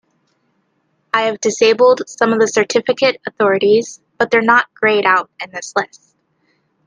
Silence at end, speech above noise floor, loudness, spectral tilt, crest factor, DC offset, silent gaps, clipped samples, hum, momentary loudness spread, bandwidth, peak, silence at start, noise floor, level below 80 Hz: 1 s; 50 dB; -14 LUFS; -3 dB/octave; 16 dB; under 0.1%; none; under 0.1%; none; 10 LU; 10 kHz; 0 dBFS; 1.15 s; -64 dBFS; -64 dBFS